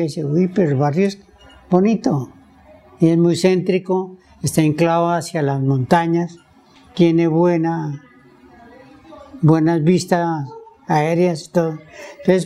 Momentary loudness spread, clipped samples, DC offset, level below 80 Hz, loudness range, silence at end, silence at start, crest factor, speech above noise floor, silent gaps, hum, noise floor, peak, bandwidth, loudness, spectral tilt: 14 LU; under 0.1%; under 0.1%; -56 dBFS; 2 LU; 0 s; 0 s; 18 dB; 32 dB; none; none; -49 dBFS; 0 dBFS; 13.5 kHz; -18 LUFS; -7 dB/octave